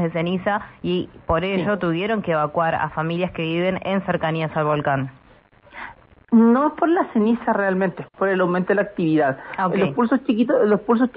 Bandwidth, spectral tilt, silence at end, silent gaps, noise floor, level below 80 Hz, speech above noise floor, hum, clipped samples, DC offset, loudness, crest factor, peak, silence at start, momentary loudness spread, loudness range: 5 kHz; -11.5 dB/octave; 0.05 s; none; -52 dBFS; -50 dBFS; 32 dB; none; under 0.1%; under 0.1%; -21 LUFS; 14 dB; -6 dBFS; 0 s; 7 LU; 3 LU